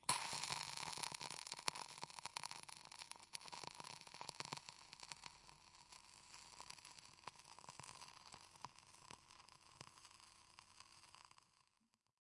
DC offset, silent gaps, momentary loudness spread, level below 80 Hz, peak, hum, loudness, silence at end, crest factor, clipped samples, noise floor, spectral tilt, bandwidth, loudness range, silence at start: under 0.1%; none; 18 LU; -84 dBFS; -16 dBFS; none; -51 LUFS; 0.6 s; 38 dB; under 0.1%; -84 dBFS; -0.5 dB/octave; 12 kHz; 13 LU; 0 s